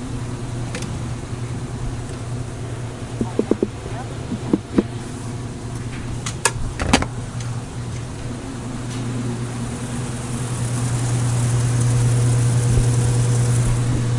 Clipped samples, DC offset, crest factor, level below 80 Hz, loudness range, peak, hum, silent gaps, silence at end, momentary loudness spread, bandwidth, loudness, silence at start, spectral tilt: under 0.1%; under 0.1%; 20 dB; -34 dBFS; 8 LU; 0 dBFS; none; none; 0 s; 12 LU; 11.5 kHz; -23 LUFS; 0 s; -5.5 dB/octave